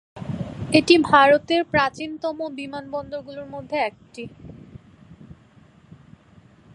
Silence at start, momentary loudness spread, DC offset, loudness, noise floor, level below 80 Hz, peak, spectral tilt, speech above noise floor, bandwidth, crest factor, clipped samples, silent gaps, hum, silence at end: 0.15 s; 22 LU; under 0.1%; -20 LUFS; -52 dBFS; -54 dBFS; 0 dBFS; -5 dB/octave; 32 dB; 11.5 kHz; 22 dB; under 0.1%; none; none; 1.6 s